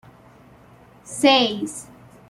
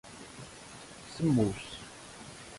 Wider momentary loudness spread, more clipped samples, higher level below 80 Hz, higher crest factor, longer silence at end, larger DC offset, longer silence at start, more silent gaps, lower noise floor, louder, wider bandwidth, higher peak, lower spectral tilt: about the same, 19 LU vs 19 LU; neither; about the same, -62 dBFS vs -58 dBFS; about the same, 20 dB vs 20 dB; first, 0.45 s vs 0 s; neither; first, 1.05 s vs 0.05 s; neither; about the same, -50 dBFS vs -49 dBFS; first, -19 LUFS vs -32 LUFS; first, 14 kHz vs 11.5 kHz; first, -4 dBFS vs -16 dBFS; second, -3 dB/octave vs -6 dB/octave